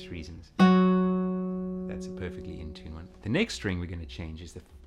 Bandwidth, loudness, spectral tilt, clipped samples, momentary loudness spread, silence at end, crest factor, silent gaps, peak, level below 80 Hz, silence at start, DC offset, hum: 9.2 kHz; -28 LUFS; -7 dB/octave; under 0.1%; 20 LU; 0 s; 20 dB; none; -10 dBFS; -50 dBFS; 0 s; under 0.1%; none